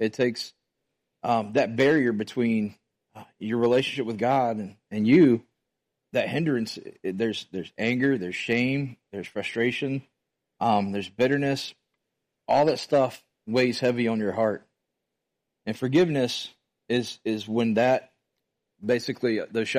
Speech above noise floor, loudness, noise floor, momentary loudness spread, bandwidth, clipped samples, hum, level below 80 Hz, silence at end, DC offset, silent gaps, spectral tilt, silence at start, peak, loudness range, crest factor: 58 dB; -25 LUFS; -83 dBFS; 13 LU; 15 kHz; under 0.1%; none; -68 dBFS; 0 s; under 0.1%; none; -6 dB/octave; 0 s; -8 dBFS; 4 LU; 18 dB